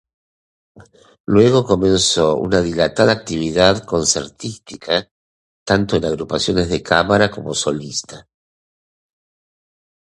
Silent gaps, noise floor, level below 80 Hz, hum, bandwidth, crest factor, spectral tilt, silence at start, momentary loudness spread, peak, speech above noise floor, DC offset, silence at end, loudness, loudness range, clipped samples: 1.20-1.24 s, 5.11-5.66 s; under -90 dBFS; -42 dBFS; none; 11.5 kHz; 18 dB; -4 dB/octave; 0.8 s; 13 LU; 0 dBFS; over 73 dB; under 0.1%; 2 s; -16 LUFS; 5 LU; under 0.1%